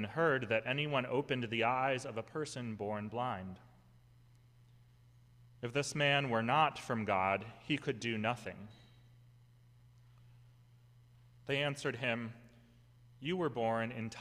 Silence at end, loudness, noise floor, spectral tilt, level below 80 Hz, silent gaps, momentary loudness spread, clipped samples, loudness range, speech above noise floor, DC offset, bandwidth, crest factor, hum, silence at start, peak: 0 s; -36 LUFS; -63 dBFS; -5 dB/octave; -72 dBFS; none; 13 LU; under 0.1%; 10 LU; 28 dB; under 0.1%; 14.5 kHz; 20 dB; none; 0 s; -18 dBFS